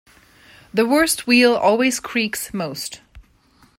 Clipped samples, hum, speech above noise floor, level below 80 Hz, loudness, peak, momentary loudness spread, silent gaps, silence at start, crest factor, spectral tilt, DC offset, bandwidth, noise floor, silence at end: under 0.1%; none; 37 dB; -54 dBFS; -18 LUFS; -2 dBFS; 12 LU; none; 0.75 s; 18 dB; -3 dB/octave; under 0.1%; 16 kHz; -55 dBFS; 0.6 s